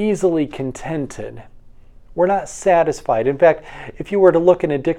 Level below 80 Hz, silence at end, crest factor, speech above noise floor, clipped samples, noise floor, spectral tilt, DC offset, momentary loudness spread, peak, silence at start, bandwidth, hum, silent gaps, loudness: -44 dBFS; 0 s; 18 dB; 25 dB; under 0.1%; -42 dBFS; -6.5 dB/octave; under 0.1%; 18 LU; 0 dBFS; 0 s; 11.5 kHz; none; none; -17 LUFS